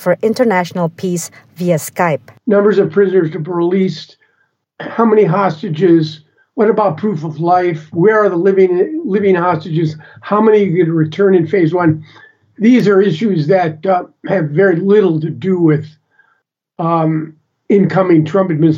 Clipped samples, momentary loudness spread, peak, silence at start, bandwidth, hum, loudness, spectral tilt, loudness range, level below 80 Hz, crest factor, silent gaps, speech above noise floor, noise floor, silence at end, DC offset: under 0.1%; 9 LU; 0 dBFS; 0 s; 16 kHz; none; -13 LUFS; -7.5 dB/octave; 2 LU; -72 dBFS; 12 dB; none; 49 dB; -62 dBFS; 0 s; under 0.1%